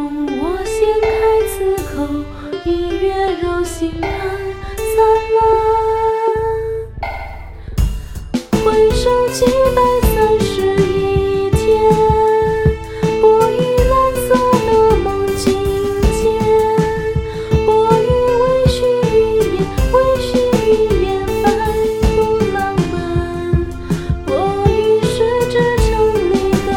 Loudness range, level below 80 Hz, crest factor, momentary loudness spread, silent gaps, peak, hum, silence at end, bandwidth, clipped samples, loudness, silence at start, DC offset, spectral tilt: 4 LU; -26 dBFS; 14 dB; 9 LU; none; 0 dBFS; none; 0 s; 17 kHz; under 0.1%; -15 LUFS; 0 s; 0.2%; -6 dB/octave